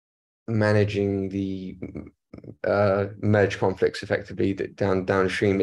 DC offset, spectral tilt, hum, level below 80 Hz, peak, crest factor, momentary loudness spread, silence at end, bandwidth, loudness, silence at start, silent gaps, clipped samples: under 0.1%; -7 dB/octave; none; -56 dBFS; -6 dBFS; 18 dB; 15 LU; 0 s; 11 kHz; -24 LUFS; 0.5 s; none; under 0.1%